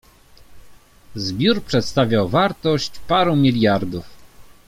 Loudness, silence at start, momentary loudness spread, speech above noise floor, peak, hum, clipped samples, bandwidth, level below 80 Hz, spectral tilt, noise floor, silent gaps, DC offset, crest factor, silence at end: -19 LUFS; 0.5 s; 12 LU; 28 dB; -2 dBFS; none; under 0.1%; 16 kHz; -46 dBFS; -6 dB/octave; -47 dBFS; none; under 0.1%; 18 dB; 0.25 s